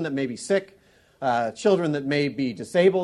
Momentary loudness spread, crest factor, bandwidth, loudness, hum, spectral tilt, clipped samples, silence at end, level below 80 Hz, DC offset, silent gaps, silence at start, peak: 8 LU; 18 dB; 11.5 kHz; -24 LUFS; none; -5.5 dB/octave; under 0.1%; 0 s; -66 dBFS; under 0.1%; none; 0 s; -6 dBFS